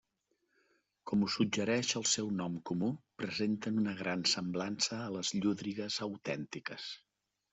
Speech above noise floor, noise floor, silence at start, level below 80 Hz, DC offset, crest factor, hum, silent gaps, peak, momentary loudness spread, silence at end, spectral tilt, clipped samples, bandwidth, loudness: 46 dB; -81 dBFS; 1.05 s; -74 dBFS; under 0.1%; 18 dB; none; none; -18 dBFS; 10 LU; 0.55 s; -3.5 dB/octave; under 0.1%; 8.2 kHz; -35 LUFS